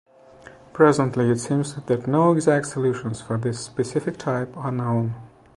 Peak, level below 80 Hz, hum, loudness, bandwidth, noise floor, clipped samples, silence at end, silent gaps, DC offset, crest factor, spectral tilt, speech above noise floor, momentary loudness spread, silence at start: -2 dBFS; -58 dBFS; none; -22 LUFS; 11.5 kHz; -47 dBFS; under 0.1%; 0.3 s; none; under 0.1%; 20 dB; -6.5 dB/octave; 25 dB; 10 LU; 0.75 s